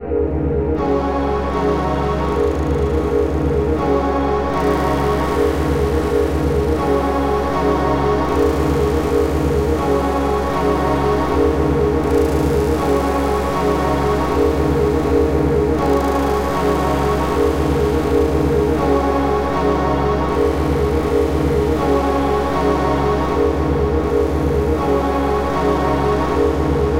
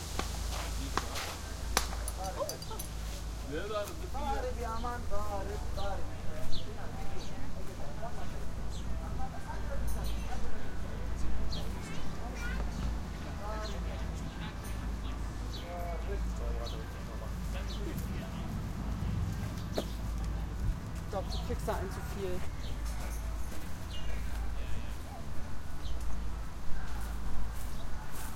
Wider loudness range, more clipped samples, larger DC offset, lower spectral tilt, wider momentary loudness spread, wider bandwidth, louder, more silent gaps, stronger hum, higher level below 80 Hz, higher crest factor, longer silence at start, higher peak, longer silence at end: second, 1 LU vs 4 LU; neither; first, 1% vs under 0.1%; first, -7 dB/octave vs -5 dB/octave; second, 2 LU vs 6 LU; about the same, 16.5 kHz vs 16.5 kHz; first, -17 LUFS vs -39 LUFS; neither; neither; first, -24 dBFS vs -40 dBFS; second, 12 dB vs 26 dB; about the same, 0 s vs 0 s; about the same, -4 dBFS vs -6 dBFS; about the same, 0 s vs 0 s